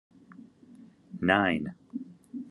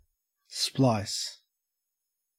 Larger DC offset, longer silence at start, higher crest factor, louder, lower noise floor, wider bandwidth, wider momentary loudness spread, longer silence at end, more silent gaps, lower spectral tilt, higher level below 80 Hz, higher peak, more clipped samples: neither; about the same, 0.4 s vs 0.5 s; about the same, 26 dB vs 22 dB; about the same, -27 LUFS vs -28 LUFS; second, -54 dBFS vs -85 dBFS; second, 11.5 kHz vs 16 kHz; first, 19 LU vs 12 LU; second, 0 s vs 1.05 s; neither; first, -7 dB/octave vs -4.5 dB/octave; about the same, -68 dBFS vs -68 dBFS; first, -6 dBFS vs -12 dBFS; neither